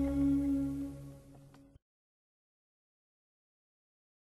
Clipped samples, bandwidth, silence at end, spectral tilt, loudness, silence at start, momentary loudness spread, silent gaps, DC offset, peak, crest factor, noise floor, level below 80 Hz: under 0.1%; 12.5 kHz; 2.85 s; -8.5 dB/octave; -34 LUFS; 0 s; 21 LU; none; under 0.1%; -24 dBFS; 16 dB; -58 dBFS; -52 dBFS